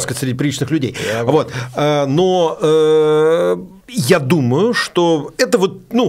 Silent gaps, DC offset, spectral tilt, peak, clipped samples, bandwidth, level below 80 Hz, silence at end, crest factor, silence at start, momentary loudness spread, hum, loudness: none; under 0.1%; -5.5 dB/octave; 0 dBFS; under 0.1%; 16 kHz; -54 dBFS; 0 s; 14 dB; 0 s; 7 LU; none; -15 LUFS